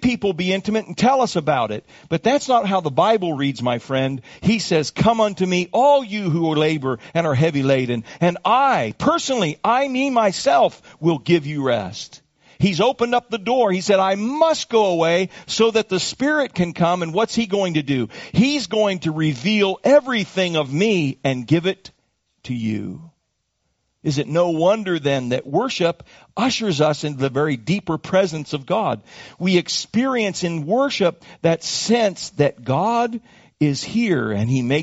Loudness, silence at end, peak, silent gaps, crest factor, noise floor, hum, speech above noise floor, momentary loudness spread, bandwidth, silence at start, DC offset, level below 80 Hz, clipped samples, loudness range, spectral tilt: -19 LUFS; 0 s; -2 dBFS; none; 18 dB; -72 dBFS; none; 53 dB; 7 LU; 8 kHz; 0 s; under 0.1%; -54 dBFS; under 0.1%; 3 LU; -4.5 dB/octave